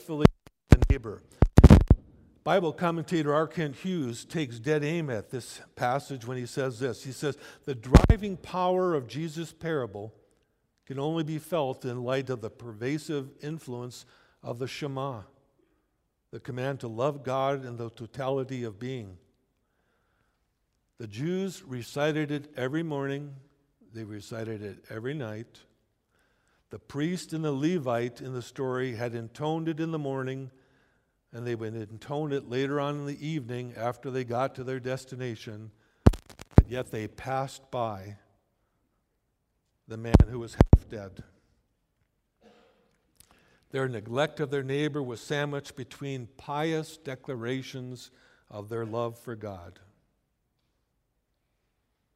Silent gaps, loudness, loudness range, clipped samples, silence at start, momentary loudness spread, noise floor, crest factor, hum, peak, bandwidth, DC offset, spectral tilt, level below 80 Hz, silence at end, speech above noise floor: none; -29 LUFS; 11 LU; under 0.1%; 0 s; 18 LU; -77 dBFS; 28 dB; none; 0 dBFS; 14.5 kHz; under 0.1%; -7 dB/octave; -36 dBFS; 2.45 s; 46 dB